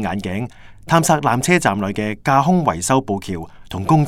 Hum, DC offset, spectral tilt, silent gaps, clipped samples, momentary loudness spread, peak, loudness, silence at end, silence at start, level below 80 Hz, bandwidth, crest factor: none; under 0.1%; -5.5 dB/octave; none; under 0.1%; 13 LU; 0 dBFS; -18 LUFS; 0 s; 0 s; -46 dBFS; 16 kHz; 18 dB